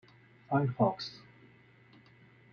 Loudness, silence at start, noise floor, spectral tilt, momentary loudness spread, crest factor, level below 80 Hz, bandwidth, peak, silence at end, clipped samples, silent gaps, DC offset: -32 LUFS; 0.5 s; -60 dBFS; -8 dB/octave; 15 LU; 20 dB; -72 dBFS; 6.8 kHz; -16 dBFS; 1.35 s; under 0.1%; none; under 0.1%